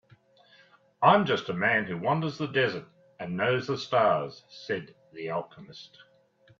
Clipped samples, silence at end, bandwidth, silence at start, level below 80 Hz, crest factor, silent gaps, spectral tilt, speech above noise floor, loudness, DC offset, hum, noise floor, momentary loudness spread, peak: under 0.1%; 0.75 s; 7.4 kHz; 1 s; -70 dBFS; 22 dB; none; -6 dB/octave; 34 dB; -27 LUFS; under 0.1%; none; -62 dBFS; 21 LU; -6 dBFS